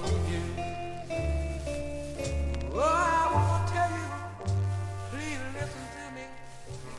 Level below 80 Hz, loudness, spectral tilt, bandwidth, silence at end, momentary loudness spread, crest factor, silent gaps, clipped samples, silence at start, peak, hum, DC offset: -40 dBFS; -31 LUFS; -6 dB/octave; 12 kHz; 0 s; 15 LU; 16 dB; none; under 0.1%; 0 s; -14 dBFS; none; under 0.1%